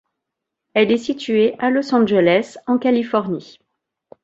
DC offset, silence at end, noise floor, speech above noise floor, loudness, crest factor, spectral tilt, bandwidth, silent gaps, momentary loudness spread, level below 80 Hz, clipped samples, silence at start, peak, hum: under 0.1%; 0.8 s; -81 dBFS; 64 dB; -18 LUFS; 16 dB; -6 dB/octave; 8 kHz; none; 7 LU; -62 dBFS; under 0.1%; 0.75 s; -2 dBFS; none